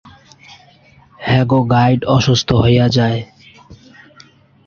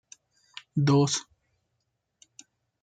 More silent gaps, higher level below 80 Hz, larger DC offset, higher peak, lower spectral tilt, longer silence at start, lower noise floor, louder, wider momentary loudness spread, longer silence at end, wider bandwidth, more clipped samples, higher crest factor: neither; first, -40 dBFS vs -72 dBFS; neither; first, -2 dBFS vs -12 dBFS; about the same, -6.5 dB/octave vs -5.5 dB/octave; first, 1.2 s vs 0.75 s; second, -47 dBFS vs -79 dBFS; first, -14 LUFS vs -25 LUFS; second, 10 LU vs 24 LU; second, 0.95 s vs 1.6 s; second, 7 kHz vs 9.2 kHz; neither; about the same, 14 dB vs 18 dB